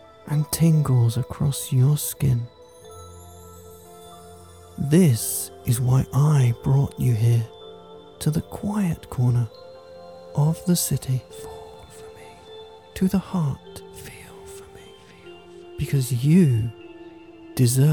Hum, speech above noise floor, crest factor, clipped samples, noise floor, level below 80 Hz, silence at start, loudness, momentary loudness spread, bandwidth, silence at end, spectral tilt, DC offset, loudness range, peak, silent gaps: none; 25 dB; 18 dB; under 0.1%; -46 dBFS; -48 dBFS; 0.25 s; -22 LUFS; 25 LU; 19 kHz; 0 s; -6.5 dB/octave; 0.1%; 9 LU; -6 dBFS; none